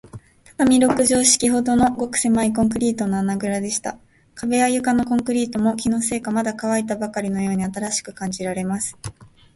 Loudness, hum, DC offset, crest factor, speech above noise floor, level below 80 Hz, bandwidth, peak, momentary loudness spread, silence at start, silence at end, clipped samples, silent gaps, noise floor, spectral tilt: -20 LUFS; none; under 0.1%; 18 dB; 22 dB; -48 dBFS; 12 kHz; -2 dBFS; 10 LU; 0.05 s; 0.3 s; under 0.1%; none; -42 dBFS; -4 dB/octave